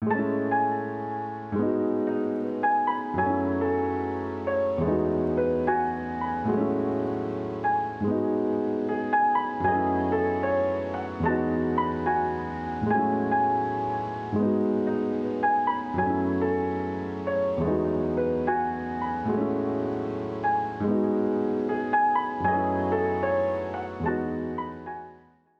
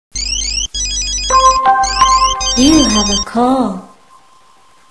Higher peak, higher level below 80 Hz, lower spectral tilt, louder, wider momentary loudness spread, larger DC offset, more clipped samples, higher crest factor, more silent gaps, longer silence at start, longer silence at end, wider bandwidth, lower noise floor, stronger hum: second, -10 dBFS vs 0 dBFS; second, -52 dBFS vs -28 dBFS; first, -9 dB/octave vs -2.5 dB/octave; second, -27 LUFS vs -12 LUFS; about the same, 6 LU vs 7 LU; second, under 0.1% vs 0.4%; neither; about the same, 16 dB vs 14 dB; neither; second, 0 s vs 0.15 s; second, 0.45 s vs 1.05 s; second, 7 kHz vs 11 kHz; first, -54 dBFS vs -48 dBFS; neither